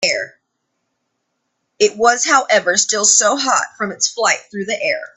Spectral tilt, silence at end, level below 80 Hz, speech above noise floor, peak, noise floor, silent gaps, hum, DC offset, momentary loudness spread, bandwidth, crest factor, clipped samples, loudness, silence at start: -0.5 dB/octave; 0.1 s; -66 dBFS; 56 dB; 0 dBFS; -72 dBFS; none; none; under 0.1%; 10 LU; 8.8 kHz; 18 dB; under 0.1%; -15 LUFS; 0 s